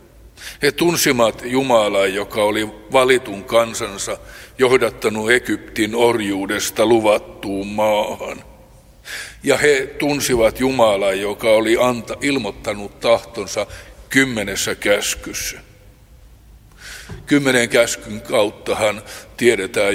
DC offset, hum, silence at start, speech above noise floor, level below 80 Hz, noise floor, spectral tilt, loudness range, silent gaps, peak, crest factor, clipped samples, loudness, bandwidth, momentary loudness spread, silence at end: under 0.1%; none; 0.25 s; 28 dB; -44 dBFS; -45 dBFS; -3.5 dB/octave; 4 LU; none; 0 dBFS; 18 dB; under 0.1%; -18 LUFS; 16.5 kHz; 14 LU; 0 s